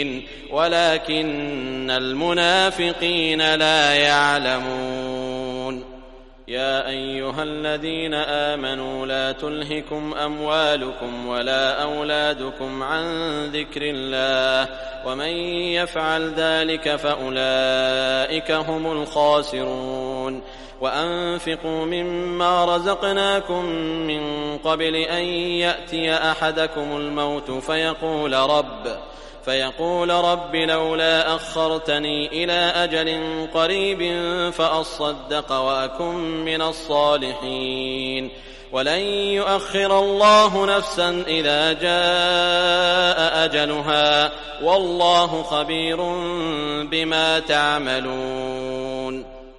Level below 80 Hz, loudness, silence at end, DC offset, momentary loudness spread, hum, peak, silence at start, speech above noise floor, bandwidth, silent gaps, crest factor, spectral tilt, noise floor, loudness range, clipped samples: -44 dBFS; -21 LUFS; 0.05 s; under 0.1%; 10 LU; none; -2 dBFS; 0 s; 22 dB; 11.5 kHz; none; 20 dB; -3.5 dB/octave; -43 dBFS; 6 LU; under 0.1%